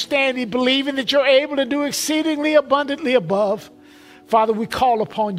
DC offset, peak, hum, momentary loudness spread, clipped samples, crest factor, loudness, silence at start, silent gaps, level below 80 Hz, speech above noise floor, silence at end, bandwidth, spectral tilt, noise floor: under 0.1%; -2 dBFS; none; 5 LU; under 0.1%; 16 dB; -18 LUFS; 0 s; none; -56 dBFS; 27 dB; 0 s; 16 kHz; -3.5 dB/octave; -45 dBFS